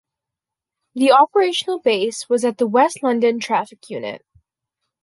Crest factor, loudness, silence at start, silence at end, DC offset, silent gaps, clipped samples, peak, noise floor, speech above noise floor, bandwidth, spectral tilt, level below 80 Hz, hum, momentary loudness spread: 18 dB; -17 LUFS; 0.95 s; 0.85 s; under 0.1%; none; under 0.1%; -2 dBFS; -86 dBFS; 68 dB; 11.5 kHz; -3.5 dB/octave; -70 dBFS; none; 17 LU